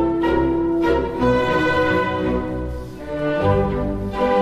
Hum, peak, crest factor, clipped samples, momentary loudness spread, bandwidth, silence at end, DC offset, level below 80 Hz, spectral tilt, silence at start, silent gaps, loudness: none; -8 dBFS; 12 dB; under 0.1%; 9 LU; 12 kHz; 0 s; 0.3%; -34 dBFS; -7.5 dB/octave; 0 s; none; -20 LUFS